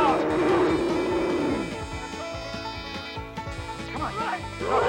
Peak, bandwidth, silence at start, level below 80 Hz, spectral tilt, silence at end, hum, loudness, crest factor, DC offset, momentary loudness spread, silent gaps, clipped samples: -10 dBFS; 16.5 kHz; 0 s; -46 dBFS; -5.5 dB/octave; 0 s; none; -27 LUFS; 16 dB; under 0.1%; 12 LU; none; under 0.1%